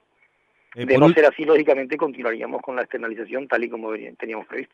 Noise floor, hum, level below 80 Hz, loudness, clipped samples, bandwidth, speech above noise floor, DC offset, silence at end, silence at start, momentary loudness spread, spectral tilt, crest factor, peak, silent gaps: -64 dBFS; none; -68 dBFS; -21 LUFS; under 0.1%; 7.4 kHz; 43 dB; under 0.1%; 0.1 s; 0.75 s; 16 LU; -7.5 dB/octave; 20 dB; -2 dBFS; none